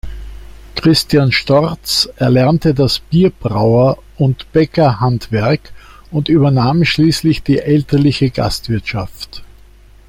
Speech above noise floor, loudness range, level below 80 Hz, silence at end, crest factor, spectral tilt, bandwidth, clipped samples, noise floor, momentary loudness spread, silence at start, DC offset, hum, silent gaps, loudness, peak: 29 dB; 2 LU; -34 dBFS; 0.65 s; 14 dB; -6 dB/octave; 16.5 kHz; under 0.1%; -41 dBFS; 9 LU; 0.05 s; under 0.1%; none; none; -13 LUFS; 0 dBFS